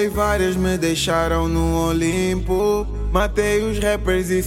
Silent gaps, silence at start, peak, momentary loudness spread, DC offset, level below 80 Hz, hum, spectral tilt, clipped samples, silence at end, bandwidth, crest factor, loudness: none; 0 s; -6 dBFS; 2 LU; under 0.1%; -28 dBFS; none; -5 dB/octave; under 0.1%; 0 s; 17 kHz; 14 dB; -20 LUFS